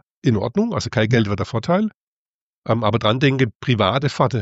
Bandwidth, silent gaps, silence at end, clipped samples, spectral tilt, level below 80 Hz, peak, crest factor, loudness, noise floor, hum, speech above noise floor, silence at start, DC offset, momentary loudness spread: 8 kHz; 1.94-2.62 s, 3.55-3.60 s; 0 s; under 0.1%; -6.5 dB/octave; -50 dBFS; -2 dBFS; 18 dB; -19 LUFS; under -90 dBFS; none; over 71 dB; 0.25 s; under 0.1%; 5 LU